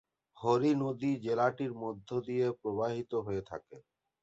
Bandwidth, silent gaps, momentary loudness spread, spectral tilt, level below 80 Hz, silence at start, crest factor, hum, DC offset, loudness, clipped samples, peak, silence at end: 8 kHz; none; 10 LU; -7.5 dB/octave; -68 dBFS; 0.35 s; 18 dB; none; under 0.1%; -33 LUFS; under 0.1%; -16 dBFS; 0.45 s